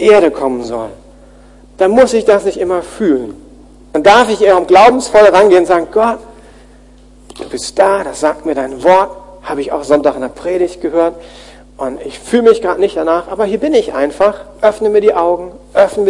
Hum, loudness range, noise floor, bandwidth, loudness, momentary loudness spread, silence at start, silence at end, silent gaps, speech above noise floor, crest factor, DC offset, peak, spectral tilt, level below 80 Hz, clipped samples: none; 6 LU; -40 dBFS; 11.5 kHz; -11 LUFS; 15 LU; 0 s; 0 s; none; 29 dB; 12 dB; under 0.1%; 0 dBFS; -4.5 dB/octave; -42 dBFS; 0.5%